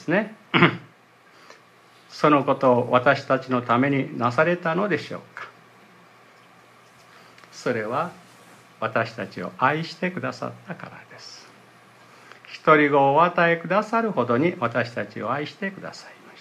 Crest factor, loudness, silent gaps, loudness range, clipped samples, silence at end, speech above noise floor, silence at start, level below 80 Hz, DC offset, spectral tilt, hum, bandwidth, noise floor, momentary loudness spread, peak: 24 dB; -22 LUFS; none; 11 LU; under 0.1%; 0.3 s; 31 dB; 0 s; -72 dBFS; under 0.1%; -6.5 dB/octave; none; 13 kHz; -54 dBFS; 20 LU; 0 dBFS